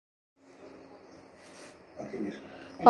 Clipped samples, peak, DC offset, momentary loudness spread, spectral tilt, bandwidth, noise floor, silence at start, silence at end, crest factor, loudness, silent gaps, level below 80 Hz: under 0.1%; -4 dBFS; under 0.1%; 16 LU; -6.5 dB/octave; 11.5 kHz; -54 dBFS; 0.6 s; 0 s; 28 dB; -45 LUFS; none; -72 dBFS